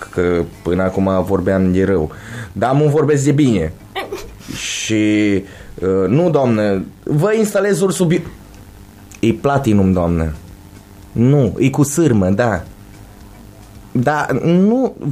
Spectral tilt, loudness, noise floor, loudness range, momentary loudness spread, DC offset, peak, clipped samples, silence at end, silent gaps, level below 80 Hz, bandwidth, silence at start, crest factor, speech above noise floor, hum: -6.5 dB/octave; -16 LUFS; -38 dBFS; 2 LU; 12 LU; under 0.1%; -2 dBFS; under 0.1%; 0 s; none; -38 dBFS; 15.5 kHz; 0 s; 14 dB; 24 dB; none